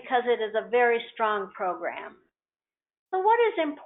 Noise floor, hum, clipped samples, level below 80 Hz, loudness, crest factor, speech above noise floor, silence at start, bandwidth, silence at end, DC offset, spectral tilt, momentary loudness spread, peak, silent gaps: under -90 dBFS; none; under 0.1%; -76 dBFS; -26 LUFS; 16 dB; over 64 dB; 0 s; 4 kHz; 0 s; under 0.1%; -0.5 dB/octave; 11 LU; -12 dBFS; 2.99-3.06 s